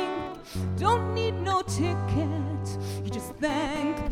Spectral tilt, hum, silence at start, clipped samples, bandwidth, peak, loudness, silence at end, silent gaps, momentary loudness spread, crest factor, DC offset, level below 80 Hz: -6 dB/octave; none; 0 s; under 0.1%; 15 kHz; -10 dBFS; -29 LUFS; 0 s; none; 8 LU; 18 dB; under 0.1%; -46 dBFS